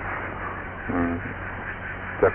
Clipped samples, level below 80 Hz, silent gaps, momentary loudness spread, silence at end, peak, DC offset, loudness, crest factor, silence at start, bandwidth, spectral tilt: under 0.1%; -42 dBFS; none; 7 LU; 0 s; -8 dBFS; under 0.1%; -29 LUFS; 20 dB; 0 s; 3.8 kHz; -6 dB/octave